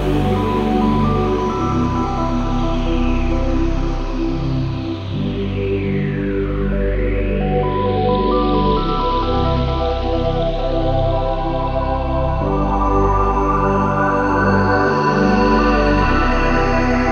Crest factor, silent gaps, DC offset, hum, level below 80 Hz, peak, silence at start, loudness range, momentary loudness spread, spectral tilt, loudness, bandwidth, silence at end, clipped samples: 14 dB; none; under 0.1%; none; -22 dBFS; -2 dBFS; 0 s; 5 LU; 6 LU; -7.5 dB/octave; -18 LUFS; 7 kHz; 0 s; under 0.1%